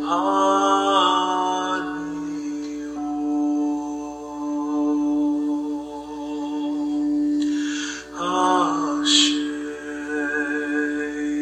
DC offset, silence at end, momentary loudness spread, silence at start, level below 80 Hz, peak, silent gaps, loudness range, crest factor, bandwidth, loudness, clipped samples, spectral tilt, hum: under 0.1%; 0 s; 13 LU; 0 s; -58 dBFS; -4 dBFS; none; 4 LU; 20 dB; 9 kHz; -22 LUFS; under 0.1%; -2.5 dB/octave; none